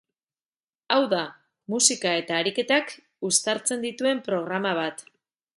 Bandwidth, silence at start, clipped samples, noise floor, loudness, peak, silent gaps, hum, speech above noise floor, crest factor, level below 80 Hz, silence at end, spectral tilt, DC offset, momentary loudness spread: 11.5 kHz; 0.9 s; under 0.1%; under -90 dBFS; -24 LUFS; -4 dBFS; none; none; over 65 dB; 24 dB; -76 dBFS; 0.55 s; -2 dB/octave; under 0.1%; 12 LU